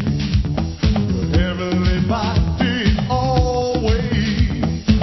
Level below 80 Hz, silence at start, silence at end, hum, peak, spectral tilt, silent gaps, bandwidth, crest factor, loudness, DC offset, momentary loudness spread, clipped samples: -24 dBFS; 0 s; 0 s; none; -2 dBFS; -7 dB/octave; none; 6.2 kHz; 16 dB; -19 LUFS; under 0.1%; 2 LU; under 0.1%